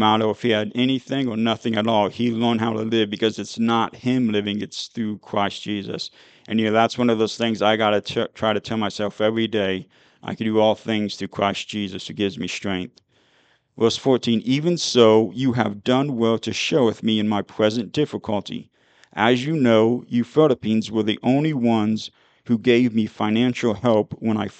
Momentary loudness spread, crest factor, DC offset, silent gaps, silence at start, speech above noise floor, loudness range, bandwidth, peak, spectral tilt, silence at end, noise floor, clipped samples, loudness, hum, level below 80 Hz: 9 LU; 20 dB; under 0.1%; none; 0 s; 40 dB; 5 LU; 8.8 kHz; -2 dBFS; -5.5 dB/octave; 0.1 s; -61 dBFS; under 0.1%; -21 LUFS; none; -62 dBFS